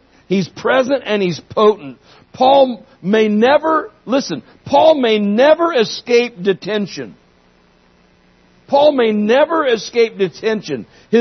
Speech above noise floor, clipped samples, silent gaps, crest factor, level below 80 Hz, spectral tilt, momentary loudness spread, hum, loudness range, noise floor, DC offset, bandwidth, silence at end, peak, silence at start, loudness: 38 dB; under 0.1%; none; 16 dB; -60 dBFS; -5.5 dB/octave; 13 LU; none; 4 LU; -52 dBFS; under 0.1%; 6.4 kHz; 0 s; 0 dBFS; 0.3 s; -15 LUFS